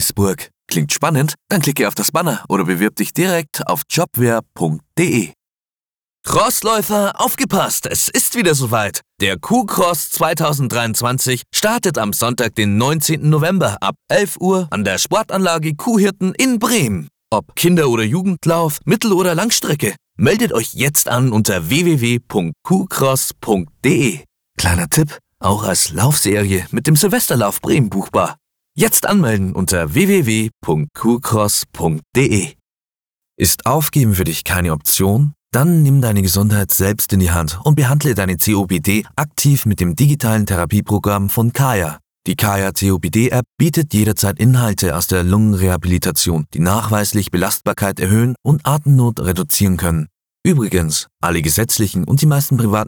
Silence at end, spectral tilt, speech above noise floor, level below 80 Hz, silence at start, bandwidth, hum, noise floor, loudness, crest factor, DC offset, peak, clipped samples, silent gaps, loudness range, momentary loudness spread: 0 s; -4.5 dB/octave; over 75 dB; -38 dBFS; 0 s; over 20 kHz; none; under -90 dBFS; -15 LUFS; 16 dB; under 0.1%; 0 dBFS; under 0.1%; none; 3 LU; 5 LU